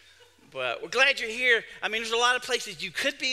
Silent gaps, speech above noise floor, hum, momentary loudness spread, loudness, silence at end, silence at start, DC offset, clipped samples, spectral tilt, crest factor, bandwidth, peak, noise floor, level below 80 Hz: none; 30 dB; none; 10 LU; -25 LUFS; 0 s; 0.55 s; under 0.1%; under 0.1%; -0.5 dB/octave; 22 dB; 15.5 kHz; -6 dBFS; -56 dBFS; -64 dBFS